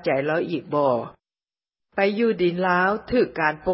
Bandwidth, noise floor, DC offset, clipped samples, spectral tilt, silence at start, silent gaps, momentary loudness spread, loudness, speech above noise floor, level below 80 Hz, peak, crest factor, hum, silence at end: 5.8 kHz; under -90 dBFS; under 0.1%; under 0.1%; -10.5 dB/octave; 0 s; none; 6 LU; -22 LUFS; over 68 dB; -54 dBFS; -4 dBFS; 18 dB; none; 0 s